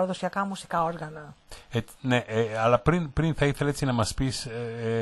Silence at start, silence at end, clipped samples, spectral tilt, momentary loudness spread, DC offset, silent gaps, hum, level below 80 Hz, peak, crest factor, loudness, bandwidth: 0 s; 0 s; under 0.1%; -6 dB/octave; 10 LU; under 0.1%; none; none; -44 dBFS; -6 dBFS; 20 dB; -27 LUFS; 12 kHz